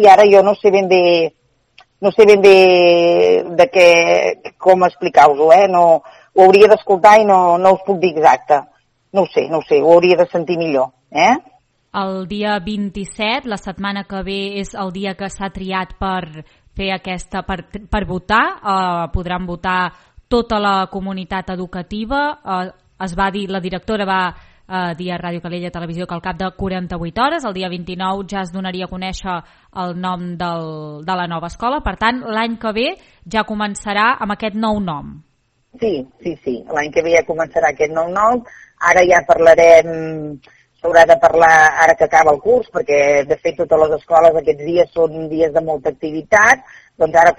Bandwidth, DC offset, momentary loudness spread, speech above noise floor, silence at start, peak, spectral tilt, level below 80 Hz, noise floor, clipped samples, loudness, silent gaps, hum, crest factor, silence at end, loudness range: 11 kHz; under 0.1%; 16 LU; 37 dB; 0 s; 0 dBFS; -5 dB/octave; -40 dBFS; -51 dBFS; 0.4%; -14 LUFS; none; none; 14 dB; 0.05 s; 12 LU